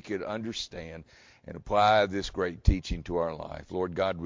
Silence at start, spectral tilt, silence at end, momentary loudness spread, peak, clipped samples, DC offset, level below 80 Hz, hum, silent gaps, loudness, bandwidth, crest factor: 0.05 s; -5.5 dB/octave; 0 s; 20 LU; -8 dBFS; under 0.1%; under 0.1%; -36 dBFS; none; none; -29 LUFS; 7.6 kHz; 22 dB